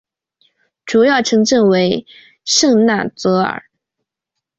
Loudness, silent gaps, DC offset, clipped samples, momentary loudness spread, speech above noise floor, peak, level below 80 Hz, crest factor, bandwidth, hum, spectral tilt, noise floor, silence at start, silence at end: -14 LUFS; none; under 0.1%; under 0.1%; 12 LU; 66 dB; -2 dBFS; -56 dBFS; 14 dB; 8 kHz; none; -4 dB/octave; -80 dBFS; 0.85 s; 1 s